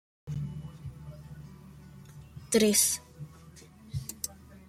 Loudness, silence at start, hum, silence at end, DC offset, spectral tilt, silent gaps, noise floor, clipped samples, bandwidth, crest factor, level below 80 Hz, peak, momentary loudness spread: -29 LUFS; 0.25 s; none; 0.05 s; under 0.1%; -3.5 dB/octave; none; -52 dBFS; under 0.1%; 16.5 kHz; 22 dB; -56 dBFS; -10 dBFS; 27 LU